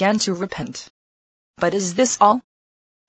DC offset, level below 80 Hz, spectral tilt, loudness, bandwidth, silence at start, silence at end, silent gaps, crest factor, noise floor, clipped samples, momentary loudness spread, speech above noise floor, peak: under 0.1%; -58 dBFS; -3.5 dB/octave; -20 LUFS; 9 kHz; 0 s; 0.7 s; 0.90-1.54 s; 20 dB; under -90 dBFS; under 0.1%; 15 LU; over 71 dB; -2 dBFS